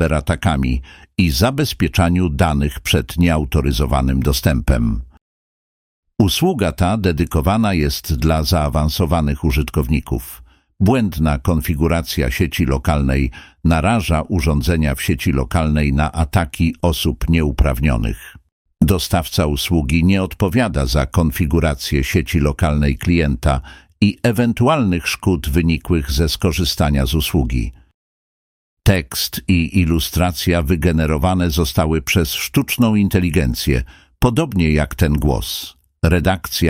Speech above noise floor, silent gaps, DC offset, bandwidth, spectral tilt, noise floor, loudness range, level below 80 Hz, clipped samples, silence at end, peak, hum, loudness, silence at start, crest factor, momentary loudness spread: over 74 dB; 5.21-6.03 s, 18.52-18.65 s, 27.94-28.77 s; under 0.1%; 16.5 kHz; -6 dB/octave; under -90 dBFS; 2 LU; -24 dBFS; under 0.1%; 0 s; -2 dBFS; none; -17 LUFS; 0 s; 14 dB; 4 LU